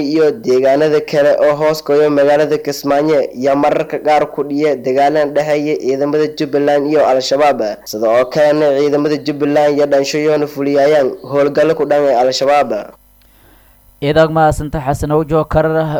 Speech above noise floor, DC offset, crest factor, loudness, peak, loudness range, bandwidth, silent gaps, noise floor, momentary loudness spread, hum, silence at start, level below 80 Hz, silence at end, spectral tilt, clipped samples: 34 dB; under 0.1%; 12 dB; -13 LUFS; 0 dBFS; 2 LU; 19.5 kHz; none; -46 dBFS; 5 LU; none; 0 s; -38 dBFS; 0 s; -6 dB/octave; under 0.1%